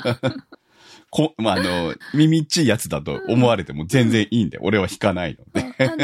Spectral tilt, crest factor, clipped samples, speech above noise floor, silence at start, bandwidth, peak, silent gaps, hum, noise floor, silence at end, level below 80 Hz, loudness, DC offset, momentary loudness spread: -5.5 dB/octave; 18 dB; under 0.1%; 30 dB; 0 s; 16 kHz; -2 dBFS; none; none; -49 dBFS; 0 s; -50 dBFS; -20 LUFS; under 0.1%; 9 LU